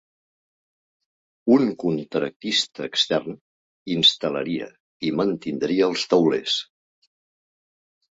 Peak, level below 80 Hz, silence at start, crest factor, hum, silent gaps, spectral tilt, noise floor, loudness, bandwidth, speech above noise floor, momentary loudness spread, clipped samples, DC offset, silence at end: -4 dBFS; -66 dBFS; 1.45 s; 20 dB; none; 2.36-2.40 s, 3.41-3.86 s, 4.80-5.00 s; -4.5 dB/octave; under -90 dBFS; -22 LUFS; 8 kHz; over 68 dB; 13 LU; under 0.1%; under 0.1%; 1.5 s